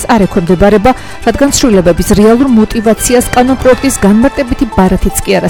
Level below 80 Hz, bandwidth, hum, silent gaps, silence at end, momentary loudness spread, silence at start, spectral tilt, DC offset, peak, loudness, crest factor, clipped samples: -22 dBFS; 18.5 kHz; none; none; 0 s; 5 LU; 0 s; -5 dB/octave; under 0.1%; 0 dBFS; -8 LUFS; 8 dB; 0.6%